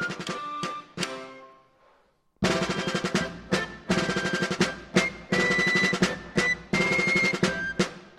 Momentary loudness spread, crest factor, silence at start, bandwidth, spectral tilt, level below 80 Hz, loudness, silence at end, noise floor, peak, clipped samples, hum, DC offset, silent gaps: 11 LU; 20 dB; 0 s; 12.5 kHz; -4 dB/octave; -54 dBFS; -26 LUFS; 0.1 s; -65 dBFS; -8 dBFS; under 0.1%; none; under 0.1%; none